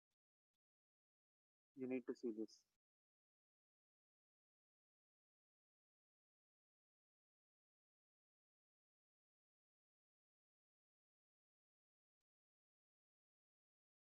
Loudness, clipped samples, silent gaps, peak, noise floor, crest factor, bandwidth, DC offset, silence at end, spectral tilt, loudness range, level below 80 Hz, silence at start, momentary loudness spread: -50 LUFS; under 0.1%; none; -36 dBFS; under -90 dBFS; 26 dB; 0.8 kHz; under 0.1%; 11.6 s; 7 dB/octave; 4 LU; under -90 dBFS; 1.75 s; 8 LU